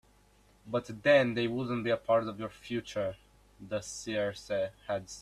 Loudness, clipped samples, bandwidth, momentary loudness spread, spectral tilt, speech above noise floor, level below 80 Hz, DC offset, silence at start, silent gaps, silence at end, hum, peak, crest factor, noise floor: -32 LUFS; under 0.1%; 13 kHz; 13 LU; -5 dB/octave; 32 dB; -64 dBFS; under 0.1%; 0.65 s; none; 0 s; none; -12 dBFS; 20 dB; -64 dBFS